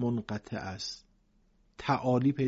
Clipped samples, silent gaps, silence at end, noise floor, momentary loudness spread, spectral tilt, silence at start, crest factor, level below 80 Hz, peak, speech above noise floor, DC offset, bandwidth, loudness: under 0.1%; none; 0 s; -67 dBFS; 12 LU; -6.5 dB/octave; 0 s; 18 dB; -60 dBFS; -14 dBFS; 37 dB; under 0.1%; 8 kHz; -33 LUFS